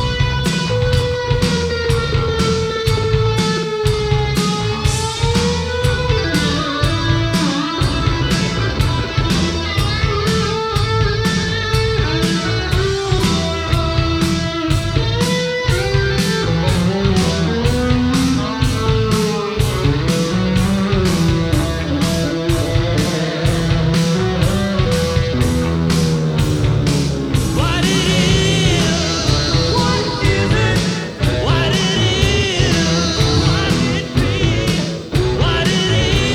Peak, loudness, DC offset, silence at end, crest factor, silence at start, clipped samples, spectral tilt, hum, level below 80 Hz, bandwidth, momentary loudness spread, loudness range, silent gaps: 0 dBFS; -16 LUFS; under 0.1%; 0 s; 14 dB; 0 s; under 0.1%; -5 dB/octave; none; -26 dBFS; 16.5 kHz; 3 LU; 2 LU; none